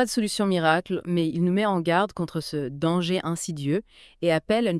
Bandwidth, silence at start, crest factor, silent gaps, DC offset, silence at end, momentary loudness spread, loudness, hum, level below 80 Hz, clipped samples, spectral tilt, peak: 12 kHz; 0 s; 18 dB; none; under 0.1%; 0 s; 7 LU; -25 LUFS; none; -58 dBFS; under 0.1%; -5.5 dB/octave; -6 dBFS